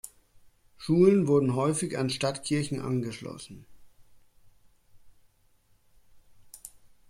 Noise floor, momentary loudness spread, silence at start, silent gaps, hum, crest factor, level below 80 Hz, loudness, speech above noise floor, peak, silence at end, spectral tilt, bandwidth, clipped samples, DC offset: -64 dBFS; 25 LU; 0.05 s; none; none; 22 dB; -62 dBFS; -26 LUFS; 38 dB; -8 dBFS; 0.4 s; -6 dB/octave; 15.5 kHz; under 0.1%; under 0.1%